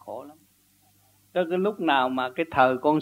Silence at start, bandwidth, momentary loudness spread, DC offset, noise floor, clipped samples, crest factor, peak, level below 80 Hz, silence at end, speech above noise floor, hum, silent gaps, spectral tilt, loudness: 0.05 s; 16 kHz; 12 LU; under 0.1%; -62 dBFS; under 0.1%; 20 dB; -6 dBFS; -64 dBFS; 0 s; 38 dB; 50 Hz at -70 dBFS; none; -6.5 dB/octave; -24 LUFS